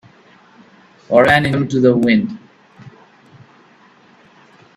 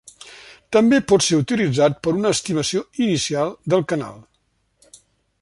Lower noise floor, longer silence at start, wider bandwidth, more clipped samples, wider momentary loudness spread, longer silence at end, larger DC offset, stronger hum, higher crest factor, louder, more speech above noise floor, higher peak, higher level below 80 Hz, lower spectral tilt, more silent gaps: second, -49 dBFS vs -67 dBFS; first, 1.1 s vs 0.25 s; about the same, 12.5 kHz vs 11.5 kHz; neither; about the same, 11 LU vs 12 LU; first, 1.9 s vs 1.2 s; neither; neither; about the same, 18 dB vs 18 dB; first, -14 LUFS vs -19 LUFS; second, 36 dB vs 48 dB; first, 0 dBFS vs -4 dBFS; about the same, -52 dBFS vs -54 dBFS; first, -7 dB/octave vs -4.5 dB/octave; neither